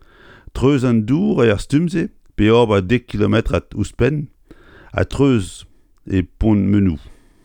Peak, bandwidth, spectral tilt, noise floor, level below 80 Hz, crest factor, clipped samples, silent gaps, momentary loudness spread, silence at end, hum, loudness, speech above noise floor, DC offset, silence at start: -2 dBFS; 11 kHz; -7.5 dB/octave; -45 dBFS; -34 dBFS; 16 dB; under 0.1%; none; 11 LU; 0.3 s; none; -17 LUFS; 29 dB; under 0.1%; 0.55 s